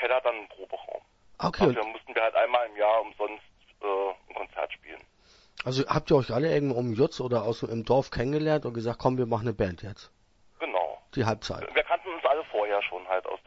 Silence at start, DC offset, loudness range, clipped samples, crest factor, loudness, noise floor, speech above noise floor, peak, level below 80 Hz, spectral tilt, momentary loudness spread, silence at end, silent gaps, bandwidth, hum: 0 s; under 0.1%; 4 LU; under 0.1%; 20 dB; -28 LUFS; -60 dBFS; 33 dB; -8 dBFS; -54 dBFS; -6.5 dB/octave; 14 LU; 0.1 s; none; 8 kHz; none